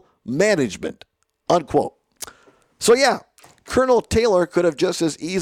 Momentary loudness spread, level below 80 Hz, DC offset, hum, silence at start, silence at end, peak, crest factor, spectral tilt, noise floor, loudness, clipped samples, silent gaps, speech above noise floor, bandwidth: 18 LU; -48 dBFS; under 0.1%; none; 0.25 s; 0 s; -6 dBFS; 14 dB; -4.5 dB/octave; -54 dBFS; -19 LUFS; under 0.1%; none; 36 dB; 16.5 kHz